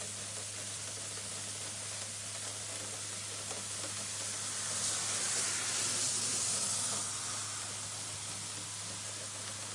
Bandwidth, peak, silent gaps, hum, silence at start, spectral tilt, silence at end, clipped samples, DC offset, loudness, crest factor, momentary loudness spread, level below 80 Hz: 11.5 kHz; -22 dBFS; none; none; 0 s; -0.5 dB/octave; 0 s; under 0.1%; under 0.1%; -35 LUFS; 16 dB; 8 LU; -74 dBFS